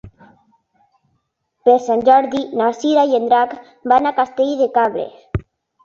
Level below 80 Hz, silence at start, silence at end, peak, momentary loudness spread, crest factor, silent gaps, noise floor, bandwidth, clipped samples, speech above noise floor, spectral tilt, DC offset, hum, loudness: -46 dBFS; 0.05 s; 0.45 s; -2 dBFS; 14 LU; 16 dB; none; -69 dBFS; 7.4 kHz; under 0.1%; 53 dB; -6 dB/octave; under 0.1%; none; -16 LUFS